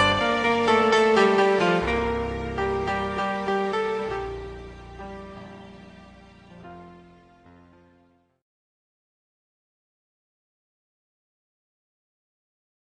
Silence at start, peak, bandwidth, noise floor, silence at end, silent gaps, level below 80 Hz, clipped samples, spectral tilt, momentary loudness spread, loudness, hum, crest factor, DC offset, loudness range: 0 s; -8 dBFS; 10 kHz; -62 dBFS; 6 s; none; -46 dBFS; under 0.1%; -5 dB/octave; 24 LU; -23 LUFS; none; 20 dB; under 0.1%; 23 LU